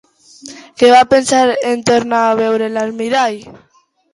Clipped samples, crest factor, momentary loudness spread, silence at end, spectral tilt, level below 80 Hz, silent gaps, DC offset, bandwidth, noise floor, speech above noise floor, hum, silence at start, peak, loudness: under 0.1%; 14 dB; 20 LU; 0.6 s; -3.5 dB/octave; -54 dBFS; none; under 0.1%; 11.5 kHz; -37 dBFS; 25 dB; none; 0.45 s; 0 dBFS; -13 LUFS